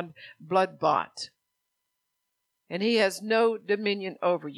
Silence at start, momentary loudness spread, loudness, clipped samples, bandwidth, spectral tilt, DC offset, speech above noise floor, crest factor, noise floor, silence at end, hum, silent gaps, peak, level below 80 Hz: 0 s; 14 LU; -27 LUFS; under 0.1%; 13.5 kHz; -4.5 dB/octave; under 0.1%; 54 dB; 18 dB; -81 dBFS; 0 s; none; none; -10 dBFS; -82 dBFS